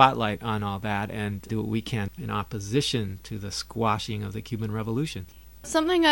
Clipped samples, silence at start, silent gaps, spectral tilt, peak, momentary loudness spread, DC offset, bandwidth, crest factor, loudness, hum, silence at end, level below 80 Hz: under 0.1%; 0 s; none; -5 dB/octave; -2 dBFS; 8 LU; 0.2%; 18.5 kHz; 24 dB; -28 LUFS; none; 0 s; -50 dBFS